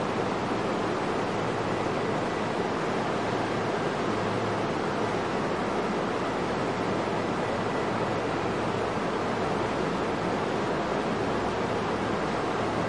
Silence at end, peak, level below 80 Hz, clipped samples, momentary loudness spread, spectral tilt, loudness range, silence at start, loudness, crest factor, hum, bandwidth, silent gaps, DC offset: 0 s; -14 dBFS; -52 dBFS; under 0.1%; 1 LU; -5.5 dB/octave; 0 LU; 0 s; -28 LUFS; 14 dB; none; 11.5 kHz; none; 0.2%